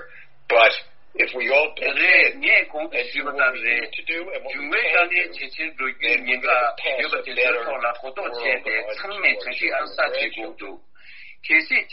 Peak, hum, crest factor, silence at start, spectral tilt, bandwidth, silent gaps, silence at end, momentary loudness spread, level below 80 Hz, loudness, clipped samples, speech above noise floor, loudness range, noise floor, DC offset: 0 dBFS; none; 22 dB; 0 s; 2.5 dB/octave; 5.8 kHz; none; 0 s; 13 LU; -64 dBFS; -20 LUFS; under 0.1%; 23 dB; 5 LU; -46 dBFS; 1%